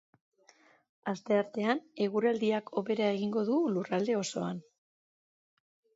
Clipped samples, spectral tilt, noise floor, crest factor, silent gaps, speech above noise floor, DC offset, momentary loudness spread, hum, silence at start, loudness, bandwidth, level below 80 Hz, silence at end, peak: under 0.1%; -5.5 dB/octave; -64 dBFS; 20 dB; none; 33 dB; under 0.1%; 9 LU; none; 1.05 s; -32 LUFS; 8 kHz; -82 dBFS; 1.35 s; -14 dBFS